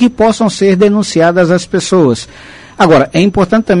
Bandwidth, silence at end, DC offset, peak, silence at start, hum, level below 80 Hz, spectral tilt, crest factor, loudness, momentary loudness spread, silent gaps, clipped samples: 11 kHz; 0 s; under 0.1%; 0 dBFS; 0 s; none; -38 dBFS; -6 dB/octave; 10 dB; -10 LUFS; 4 LU; none; under 0.1%